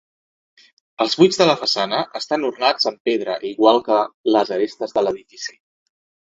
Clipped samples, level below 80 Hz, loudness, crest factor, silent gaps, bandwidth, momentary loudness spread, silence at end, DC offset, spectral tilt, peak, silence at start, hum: under 0.1%; -64 dBFS; -19 LUFS; 20 dB; 3.00-3.05 s, 4.14-4.24 s; 8 kHz; 9 LU; 0.7 s; under 0.1%; -4 dB/octave; 0 dBFS; 1 s; none